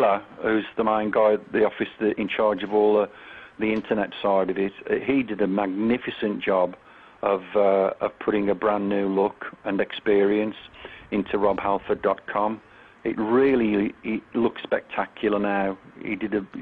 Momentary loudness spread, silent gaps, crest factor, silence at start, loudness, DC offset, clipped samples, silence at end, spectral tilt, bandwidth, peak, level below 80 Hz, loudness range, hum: 9 LU; none; 16 dB; 0 s; -24 LUFS; under 0.1%; under 0.1%; 0 s; -9 dB/octave; 4.7 kHz; -8 dBFS; -58 dBFS; 2 LU; none